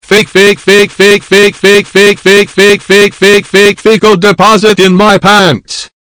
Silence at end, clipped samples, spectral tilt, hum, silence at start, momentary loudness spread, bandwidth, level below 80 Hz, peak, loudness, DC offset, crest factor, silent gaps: 0.3 s; 20%; -4 dB/octave; none; 0.1 s; 2 LU; over 20 kHz; -40 dBFS; 0 dBFS; -5 LUFS; under 0.1%; 6 dB; none